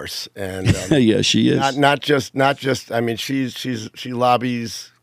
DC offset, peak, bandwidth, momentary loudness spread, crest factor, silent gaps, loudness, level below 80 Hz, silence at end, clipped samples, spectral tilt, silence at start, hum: under 0.1%; 0 dBFS; 16 kHz; 12 LU; 18 dB; none; -19 LUFS; -46 dBFS; 0.15 s; under 0.1%; -5 dB/octave; 0 s; none